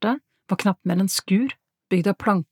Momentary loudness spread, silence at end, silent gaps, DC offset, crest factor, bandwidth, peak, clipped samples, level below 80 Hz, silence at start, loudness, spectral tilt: 7 LU; 0.1 s; none; under 0.1%; 18 dB; 17.5 kHz; -6 dBFS; under 0.1%; -64 dBFS; 0 s; -23 LUFS; -5.5 dB/octave